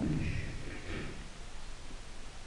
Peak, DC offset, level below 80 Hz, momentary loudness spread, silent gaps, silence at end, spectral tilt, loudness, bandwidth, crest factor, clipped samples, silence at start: -22 dBFS; under 0.1%; -46 dBFS; 13 LU; none; 0 s; -5.5 dB/octave; -42 LUFS; 11 kHz; 16 dB; under 0.1%; 0 s